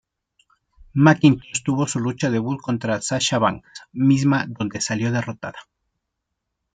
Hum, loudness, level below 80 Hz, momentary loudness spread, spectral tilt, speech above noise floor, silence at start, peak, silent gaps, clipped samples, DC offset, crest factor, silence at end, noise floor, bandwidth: none; -20 LUFS; -56 dBFS; 12 LU; -5 dB/octave; 59 dB; 0.95 s; -2 dBFS; none; under 0.1%; under 0.1%; 20 dB; 1.1 s; -79 dBFS; 9.6 kHz